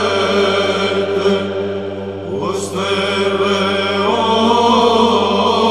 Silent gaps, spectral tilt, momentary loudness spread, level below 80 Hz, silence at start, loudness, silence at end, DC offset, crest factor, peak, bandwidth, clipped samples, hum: none; -4.5 dB/octave; 10 LU; -58 dBFS; 0 s; -15 LUFS; 0 s; 0.5%; 14 dB; -2 dBFS; 13 kHz; under 0.1%; none